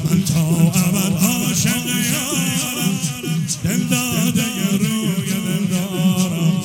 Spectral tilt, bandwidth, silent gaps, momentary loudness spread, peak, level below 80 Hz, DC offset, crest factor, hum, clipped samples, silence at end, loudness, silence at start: -4.5 dB/octave; 17.5 kHz; none; 5 LU; -2 dBFS; -48 dBFS; under 0.1%; 16 dB; none; under 0.1%; 0 s; -18 LUFS; 0 s